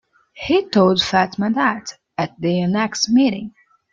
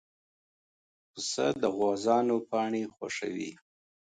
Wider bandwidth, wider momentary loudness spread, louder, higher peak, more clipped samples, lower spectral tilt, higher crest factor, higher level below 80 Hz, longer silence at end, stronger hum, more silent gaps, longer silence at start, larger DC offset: second, 7.6 kHz vs 9.6 kHz; first, 15 LU vs 11 LU; first, -18 LUFS vs -30 LUFS; first, -2 dBFS vs -12 dBFS; neither; about the same, -5 dB/octave vs -4 dB/octave; about the same, 16 dB vs 20 dB; first, -54 dBFS vs -74 dBFS; about the same, 0.45 s vs 0.5 s; neither; neither; second, 0.35 s vs 1.15 s; neither